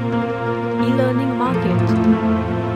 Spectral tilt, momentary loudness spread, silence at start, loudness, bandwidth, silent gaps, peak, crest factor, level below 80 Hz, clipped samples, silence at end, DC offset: -8.5 dB/octave; 5 LU; 0 s; -18 LUFS; 9.6 kHz; none; -4 dBFS; 14 dB; -42 dBFS; under 0.1%; 0 s; under 0.1%